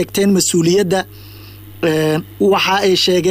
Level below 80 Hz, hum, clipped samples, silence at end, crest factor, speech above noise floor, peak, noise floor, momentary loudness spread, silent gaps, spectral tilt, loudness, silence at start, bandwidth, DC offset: -48 dBFS; none; under 0.1%; 0 s; 10 dB; 21 dB; -4 dBFS; -35 dBFS; 7 LU; none; -4 dB/octave; -14 LUFS; 0 s; 16 kHz; under 0.1%